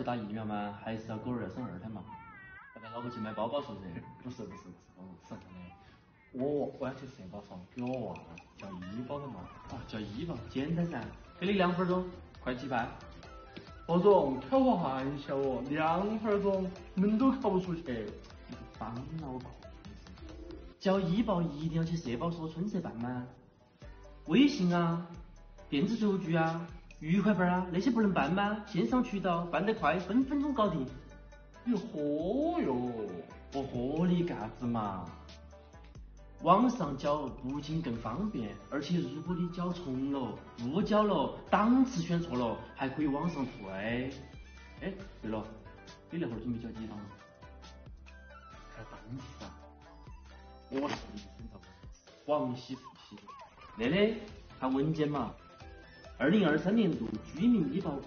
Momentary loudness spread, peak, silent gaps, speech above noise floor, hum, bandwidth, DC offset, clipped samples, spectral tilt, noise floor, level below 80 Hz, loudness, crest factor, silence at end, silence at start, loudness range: 23 LU; -12 dBFS; none; 22 dB; none; 6.6 kHz; under 0.1%; under 0.1%; -6 dB/octave; -55 dBFS; -56 dBFS; -33 LUFS; 22 dB; 0 s; 0 s; 11 LU